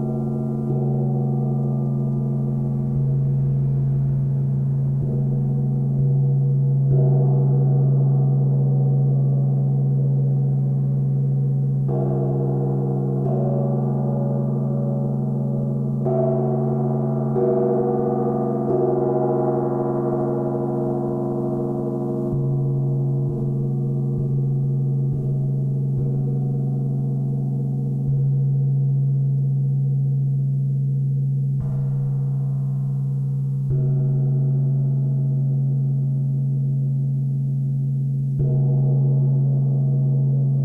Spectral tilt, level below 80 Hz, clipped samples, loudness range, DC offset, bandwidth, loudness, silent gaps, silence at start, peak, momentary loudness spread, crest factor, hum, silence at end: -13.5 dB/octave; -46 dBFS; under 0.1%; 4 LU; under 0.1%; 1.6 kHz; -21 LUFS; none; 0 s; -8 dBFS; 4 LU; 12 dB; none; 0 s